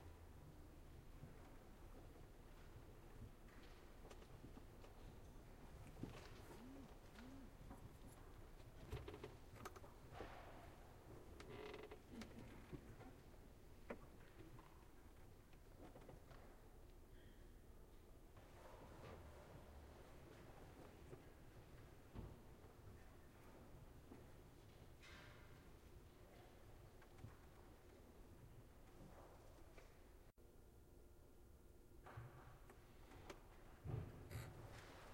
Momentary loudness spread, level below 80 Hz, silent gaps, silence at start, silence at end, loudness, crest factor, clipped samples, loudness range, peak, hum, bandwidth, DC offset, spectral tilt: 10 LU; -64 dBFS; none; 0 s; 0 s; -62 LUFS; 24 dB; under 0.1%; 6 LU; -38 dBFS; none; 16 kHz; under 0.1%; -6 dB/octave